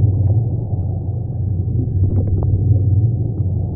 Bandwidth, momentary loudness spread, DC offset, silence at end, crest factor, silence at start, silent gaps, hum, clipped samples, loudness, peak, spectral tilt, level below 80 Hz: 1.2 kHz; 7 LU; 0.1%; 0 s; 12 dB; 0 s; none; none; under 0.1%; -18 LUFS; -4 dBFS; -18.5 dB/octave; -30 dBFS